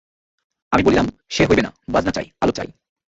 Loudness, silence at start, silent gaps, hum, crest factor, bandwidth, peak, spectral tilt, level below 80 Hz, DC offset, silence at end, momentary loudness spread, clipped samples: -19 LUFS; 0.7 s; none; none; 18 dB; 8 kHz; -2 dBFS; -5.5 dB/octave; -40 dBFS; under 0.1%; 0.4 s; 8 LU; under 0.1%